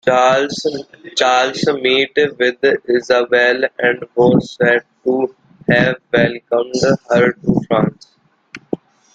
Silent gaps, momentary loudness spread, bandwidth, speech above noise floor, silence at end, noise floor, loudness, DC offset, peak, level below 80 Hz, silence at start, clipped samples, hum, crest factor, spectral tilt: none; 9 LU; 9 kHz; 25 dB; 0.4 s; -40 dBFS; -15 LUFS; under 0.1%; 0 dBFS; -50 dBFS; 0.05 s; under 0.1%; none; 14 dB; -5 dB/octave